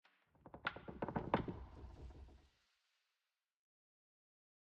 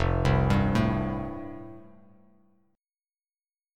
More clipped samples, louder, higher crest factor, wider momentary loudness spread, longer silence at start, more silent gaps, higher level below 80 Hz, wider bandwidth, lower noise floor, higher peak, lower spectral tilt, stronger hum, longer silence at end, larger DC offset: neither; second, -45 LUFS vs -26 LUFS; first, 30 dB vs 20 dB; about the same, 21 LU vs 19 LU; first, 0.45 s vs 0 s; neither; second, -62 dBFS vs -38 dBFS; second, 8.2 kHz vs 10.5 kHz; about the same, under -90 dBFS vs under -90 dBFS; second, -20 dBFS vs -10 dBFS; about the same, -8 dB/octave vs -7.5 dB/octave; neither; first, 2.2 s vs 1.95 s; neither